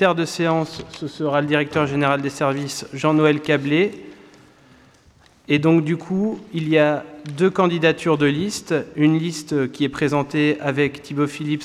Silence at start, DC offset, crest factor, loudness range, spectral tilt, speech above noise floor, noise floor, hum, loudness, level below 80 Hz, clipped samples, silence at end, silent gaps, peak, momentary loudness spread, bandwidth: 0 s; under 0.1%; 16 dB; 3 LU; -6 dB/octave; 33 dB; -53 dBFS; none; -20 LUFS; -58 dBFS; under 0.1%; 0 s; none; -4 dBFS; 7 LU; 13.5 kHz